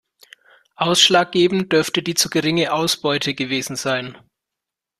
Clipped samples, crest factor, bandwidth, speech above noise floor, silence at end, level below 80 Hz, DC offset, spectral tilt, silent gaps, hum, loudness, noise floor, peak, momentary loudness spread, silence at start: under 0.1%; 20 dB; 14 kHz; 66 dB; 0.85 s; -60 dBFS; under 0.1%; -3 dB/octave; none; none; -18 LUFS; -84 dBFS; 0 dBFS; 10 LU; 0.8 s